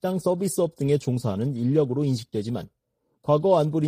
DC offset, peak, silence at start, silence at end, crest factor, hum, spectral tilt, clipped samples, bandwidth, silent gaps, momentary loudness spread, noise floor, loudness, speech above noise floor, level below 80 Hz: under 0.1%; -8 dBFS; 0.05 s; 0 s; 16 dB; none; -7.5 dB/octave; under 0.1%; 15.5 kHz; none; 9 LU; -63 dBFS; -24 LUFS; 39 dB; -62 dBFS